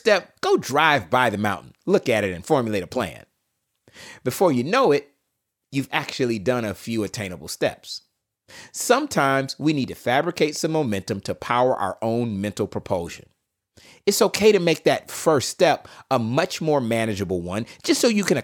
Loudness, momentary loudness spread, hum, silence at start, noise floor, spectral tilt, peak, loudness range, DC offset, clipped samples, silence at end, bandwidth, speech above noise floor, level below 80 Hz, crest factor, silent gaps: -22 LUFS; 10 LU; none; 0.05 s; -78 dBFS; -4.5 dB/octave; -2 dBFS; 5 LU; under 0.1%; under 0.1%; 0 s; 18 kHz; 56 dB; -62 dBFS; 20 dB; none